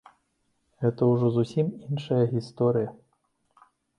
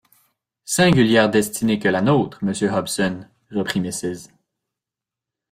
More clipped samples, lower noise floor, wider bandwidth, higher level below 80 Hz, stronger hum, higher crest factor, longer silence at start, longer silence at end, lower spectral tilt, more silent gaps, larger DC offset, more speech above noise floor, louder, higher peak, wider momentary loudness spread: neither; second, -73 dBFS vs -87 dBFS; second, 10 kHz vs 16 kHz; second, -66 dBFS vs -54 dBFS; neither; about the same, 16 dB vs 18 dB; first, 0.8 s vs 0.65 s; second, 1.05 s vs 1.25 s; first, -9 dB/octave vs -5 dB/octave; neither; neither; second, 48 dB vs 69 dB; second, -26 LUFS vs -19 LUFS; second, -10 dBFS vs -2 dBFS; second, 6 LU vs 13 LU